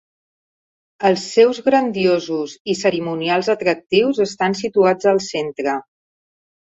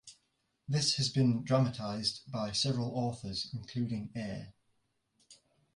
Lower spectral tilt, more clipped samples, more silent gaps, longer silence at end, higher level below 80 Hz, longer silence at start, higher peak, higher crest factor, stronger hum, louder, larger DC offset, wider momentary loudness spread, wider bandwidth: about the same, -5 dB/octave vs -5 dB/octave; neither; first, 2.60-2.65 s vs none; first, 0.95 s vs 0.4 s; about the same, -62 dBFS vs -64 dBFS; first, 1 s vs 0.05 s; first, -2 dBFS vs -14 dBFS; about the same, 18 dB vs 20 dB; neither; first, -18 LUFS vs -33 LUFS; neither; about the same, 9 LU vs 11 LU; second, 8 kHz vs 11.5 kHz